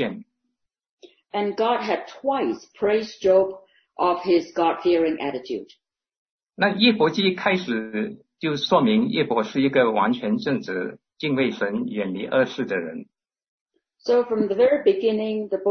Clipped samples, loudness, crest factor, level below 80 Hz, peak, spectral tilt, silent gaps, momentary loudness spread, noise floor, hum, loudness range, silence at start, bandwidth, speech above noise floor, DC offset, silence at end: under 0.1%; -22 LUFS; 18 dB; -64 dBFS; -4 dBFS; -6 dB/octave; 0.89-0.98 s, 6.18-6.39 s, 13.48-13.66 s; 11 LU; -78 dBFS; none; 4 LU; 0 s; 6.6 kHz; 56 dB; under 0.1%; 0 s